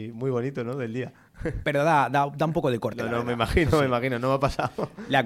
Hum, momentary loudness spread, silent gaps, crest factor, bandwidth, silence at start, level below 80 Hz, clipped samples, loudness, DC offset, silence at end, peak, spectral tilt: none; 11 LU; none; 18 dB; 16 kHz; 0 s; -42 dBFS; under 0.1%; -26 LUFS; under 0.1%; 0 s; -6 dBFS; -6.5 dB/octave